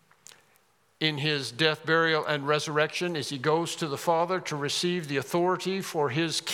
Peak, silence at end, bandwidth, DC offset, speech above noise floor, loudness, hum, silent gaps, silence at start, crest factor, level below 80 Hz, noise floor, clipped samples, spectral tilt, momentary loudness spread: -6 dBFS; 0 s; 17 kHz; under 0.1%; 38 dB; -27 LUFS; none; none; 1 s; 22 dB; -80 dBFS; -66 dBFS; under 0.1%; -4 dB/octave; 6 LU